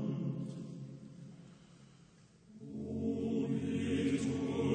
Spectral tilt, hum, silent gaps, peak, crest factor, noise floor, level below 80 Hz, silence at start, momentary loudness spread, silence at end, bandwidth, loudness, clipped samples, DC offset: -7 dB/octave; none; none; -20 dBFS; 18 dB; -62 dBFS; -68 dBFS; 0 s; 20 LU; 0 s; 9.6 kHz; -37 LUFS; under 0.1%; under 0.1%